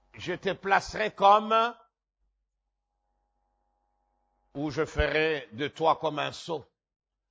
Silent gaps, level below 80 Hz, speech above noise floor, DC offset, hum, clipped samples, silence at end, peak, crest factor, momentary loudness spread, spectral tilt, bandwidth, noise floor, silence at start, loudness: none; -48 dBFS; 56 dB; under 0.1%; none; under 0.1%; 0.7 s; -8 dBFS; 22 dB; 15 LU; -5 dB/octave; 8 kHz; -83 dBFS; 0.15 s; -27 LUFS